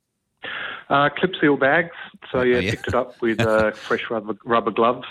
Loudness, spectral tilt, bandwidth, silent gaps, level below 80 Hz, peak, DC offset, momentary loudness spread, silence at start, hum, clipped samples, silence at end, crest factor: -21 LUFS; -6 dB/octave; 13 kHz; none; -52 dBFS; -4 dBFS; under 0.1%; 12 LU; 0.45 s; none; under 0.1%; 0 s; 16 dB